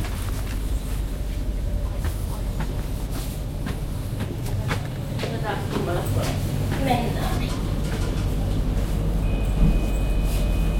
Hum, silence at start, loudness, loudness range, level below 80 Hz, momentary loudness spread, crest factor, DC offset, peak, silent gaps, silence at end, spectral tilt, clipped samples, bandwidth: none; 0 s; -27 LUFS; 4 LU; -26 dBFS; 7 LU; 18 dB; under 0.1%; -6 dBFS; none; 0 s; -6 dB/octave; under 0.1%; 16.5 kHz